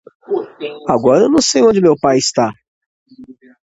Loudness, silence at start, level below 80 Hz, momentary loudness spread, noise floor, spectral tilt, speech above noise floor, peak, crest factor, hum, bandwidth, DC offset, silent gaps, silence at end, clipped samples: -13 LUFS; 0.3 s; -52 dBFS; 12 LU; -39 dBFS; -4.5 dB/octave; 27 dB; 0 dBFS; 14 dB; none; 8.2 kHz; under 0.1%; 2.68-3.06 s; 0.45 s; under 0.1%